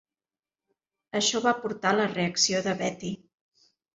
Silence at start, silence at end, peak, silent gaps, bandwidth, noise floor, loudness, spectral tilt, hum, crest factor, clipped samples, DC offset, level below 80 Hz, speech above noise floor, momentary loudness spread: 1.15 s; 0.8 s; -8 dBFS; none; 8 kHz; under -90 dBFS; -26 LUFS; -3 dB/octave; none; 20 dB; under 0.1%; under 0.1%; -68 dBFS; over 63 dB; 12 LU